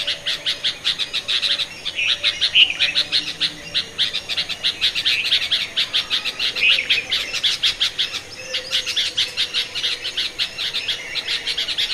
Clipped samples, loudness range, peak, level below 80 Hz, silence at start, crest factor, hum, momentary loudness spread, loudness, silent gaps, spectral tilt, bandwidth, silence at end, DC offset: under 0.1%; 3 LU; -2 dBFS; -52 dBFS; 0 s; 20 dB; none; 8 LU; -19 LUFS; none; 0.5 dB/octave; 14 kHz; 0 s; under 0.1%